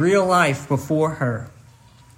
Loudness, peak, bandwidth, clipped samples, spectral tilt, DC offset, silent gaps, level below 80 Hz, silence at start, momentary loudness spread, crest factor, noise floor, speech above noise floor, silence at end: -20 LUFS; -4 dBFS; 16 kHz; under 0.1%; -6 dB/octave; under 0.1%; none; -56 dBFS; 0 s; 13 LU; 16 dB; -49 dBFS; 30 dB; 0.7 s